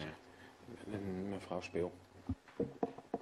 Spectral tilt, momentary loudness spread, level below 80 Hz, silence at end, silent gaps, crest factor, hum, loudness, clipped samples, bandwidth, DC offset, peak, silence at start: -7 dB/octave; 14 LU; -62 dBFS; 0 s; none; 24 dB; none; -44 LUFS; under 0.1%; 13 kHz; under 0.1%; -20 dBFS; 0 s